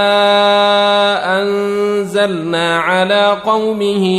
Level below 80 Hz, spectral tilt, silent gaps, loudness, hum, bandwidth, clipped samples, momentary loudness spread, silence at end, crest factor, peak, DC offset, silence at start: -56 dBFS; -4.5 dB/octave; none; -13 LUFS; none; 13.5 kHz; under 0.1%; 5 LU; 0 s; 12 dB; -2 dBFS; under 0.1%; 0 s